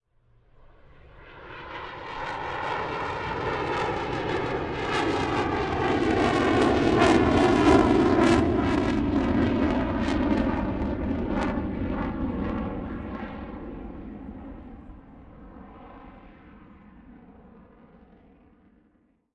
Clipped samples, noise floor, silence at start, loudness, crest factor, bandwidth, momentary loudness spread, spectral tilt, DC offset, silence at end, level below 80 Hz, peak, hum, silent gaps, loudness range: under 0.1%; -65 dBFS; 1.15 s; -25 LUFS; 22 dB; 11 kHz; 21 LU; -6.5 dB/octave; under 0.1%; 1.85 s; -40 dBFS; -6 dBFS; none; none; 18 LU